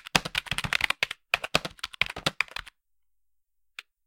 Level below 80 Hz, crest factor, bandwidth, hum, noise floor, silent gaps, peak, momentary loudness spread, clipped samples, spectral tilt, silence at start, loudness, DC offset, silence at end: -52 dBFS; 30 dB; 17 kHz; none; -85 dBFS; none; -2 dBFS; 15 LU; under 0.1%; -2 dB/octave; 0.05 s; -28 LUFS; under 0.1%; 1.4 s